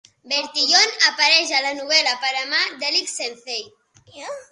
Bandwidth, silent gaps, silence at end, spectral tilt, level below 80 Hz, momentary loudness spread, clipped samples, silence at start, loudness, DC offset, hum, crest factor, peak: 11.5 kHz; none; 0.1 s; 2 dB/octave; -74 dBFS; 15 LU; under 0.1%; 0.25 s; -17 LUFS; under 0.1%; none; 22 dB; 0 dBFS